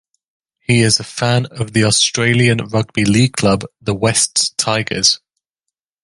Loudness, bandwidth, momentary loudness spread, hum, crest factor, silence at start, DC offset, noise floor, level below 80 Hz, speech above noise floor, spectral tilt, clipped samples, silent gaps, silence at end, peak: -14 LUFS; 11.5 kHz; 7 LU; none; 16 dB; 0.7 s; under 0.1%; -80 dBFS; -46 dBFS; 65 dB; -3.5 dB/octave; under 0.1%; none; 0.85 s; 0 dBFS